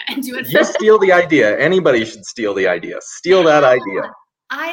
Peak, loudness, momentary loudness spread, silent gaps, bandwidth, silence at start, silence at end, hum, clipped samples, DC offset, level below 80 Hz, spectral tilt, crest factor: 0 dBFS; -14 LUFS; 14 LU; none; 17 kHz; 0 s; 0 s; none; under 0.1%; under 0.1%; -60 dBFS; -4.5 dB/octave; 14 dB